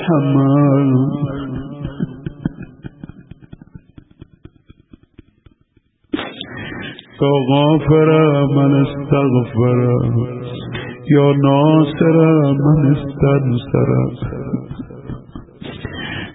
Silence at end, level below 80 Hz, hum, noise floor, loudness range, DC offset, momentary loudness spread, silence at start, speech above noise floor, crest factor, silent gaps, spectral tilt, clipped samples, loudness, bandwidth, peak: 0 s; -42 dBFS; none; -58 dBFS; 18 LU; under 0.1%; 18 LU; 0 s; 46 dB; 14 dB; none; -13.5 dB/octave; under 0.1%; -15 LUFS; 4 kHz; -2 dBFS